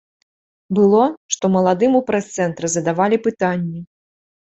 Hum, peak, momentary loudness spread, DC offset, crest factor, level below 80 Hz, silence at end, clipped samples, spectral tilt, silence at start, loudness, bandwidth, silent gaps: none; -2 dBFS; 9 LU; under 0.1%; 16 dB; -60 dBFS; 0.65 s; under 0.1%; -5.5 dB/octave; 0.7 s; -18 LUFS; 8.2 kHz; 1.17-1.29 s